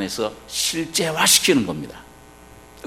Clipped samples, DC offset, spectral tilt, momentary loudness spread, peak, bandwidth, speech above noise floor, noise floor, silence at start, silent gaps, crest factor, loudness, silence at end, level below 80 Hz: under 0.1%; under 0.1%; -2 dB/octave; 15 LU; 0 dBFS; 16 kHz; 24 dB; -45 dBFS; 0 s; none; 22 dB; -18 LUFS; 0.05 s; -52 dBFS